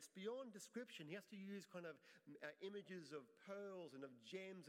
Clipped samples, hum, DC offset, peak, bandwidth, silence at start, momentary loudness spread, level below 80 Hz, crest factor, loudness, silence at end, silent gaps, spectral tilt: under 0.1%; none; under 0.1%; -38 dBFS; 16 kHz; 0 s; 6 LU; under -90 dBFS; 18 dB; -56 LUFS; 0 s; none; -4.5 dB/octave